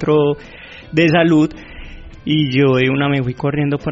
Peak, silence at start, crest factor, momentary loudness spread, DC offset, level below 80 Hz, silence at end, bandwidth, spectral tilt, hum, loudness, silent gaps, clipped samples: -2 dBFS; 0 s; 14 dB; 22 LU; under 0.1%; -40 dBFS; 0 s; 7.8 kHz; -5.5 dB/octave; none; -15 LUFS; none; under 0.1%